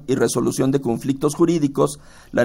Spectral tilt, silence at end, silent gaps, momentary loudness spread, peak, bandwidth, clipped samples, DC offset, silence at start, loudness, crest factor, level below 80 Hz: -6 dB/octave; 0 s; none; 5 LU; -4 dBFS; 16 kHz; under 0.1%; under 0.1%; 0 s; -20 LUFS; 16 dB; -48 dBFS